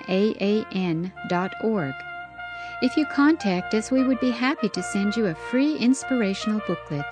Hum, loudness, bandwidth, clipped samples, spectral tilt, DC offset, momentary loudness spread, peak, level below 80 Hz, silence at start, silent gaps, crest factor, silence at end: none; -24 LUFS; 10.5 kHz; under 0.1%; -5.5 dB/octave; under 0.1%; 9 LU; -8 dBFS; -58 dBFS; 0 s; none; 16 dB; 0 s